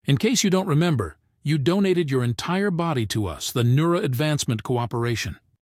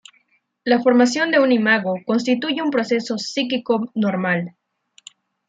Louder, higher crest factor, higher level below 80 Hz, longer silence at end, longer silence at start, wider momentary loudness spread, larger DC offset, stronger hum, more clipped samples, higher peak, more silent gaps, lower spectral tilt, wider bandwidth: second, -23 LUFS vs -19 LUFS; about the same, 18 dB vs 18 dB; first, -50 dBFS vs -72 dBFS; second, 0.25 s vs 1 s; second, 0.05 s vs 0.65 s; about the same, 6 LU vs 7 LU; neither; neither; neither; second, -6 dBFS vs -2 dBFS; neither; about the same, -5.5 dB/octave vs -5 dB/octave; first, 16 kHz vs 9 kHz